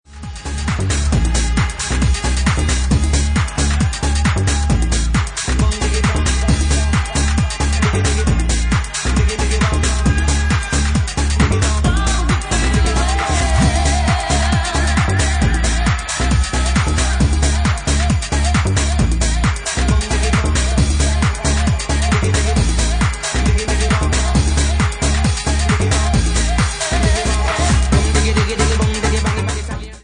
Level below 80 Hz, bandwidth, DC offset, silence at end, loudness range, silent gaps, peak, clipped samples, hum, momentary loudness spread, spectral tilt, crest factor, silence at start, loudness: -18 dBFS; 10.5 kHz; under 0.1%; 0.05 s; 1 LU; none; 0 dBFS; under 0.1%; none; 3 LU; -4.5 dB/octave; 14 dB; 0.1 s; -16 LUFS